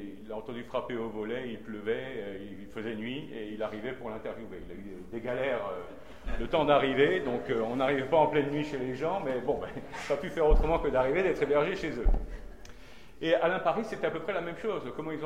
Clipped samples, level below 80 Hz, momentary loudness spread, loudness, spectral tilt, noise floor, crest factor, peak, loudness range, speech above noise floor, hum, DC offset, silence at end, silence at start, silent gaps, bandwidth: under 0.1%; -38 dBFS; 16 LU; -31 LUFS; -6.5 dB/octave; -52 dBFS; 20 dB; -10 dBFS; 9 LU; 22 dB; none; 0.4%; 0 s; 0 s; none; 11 kHz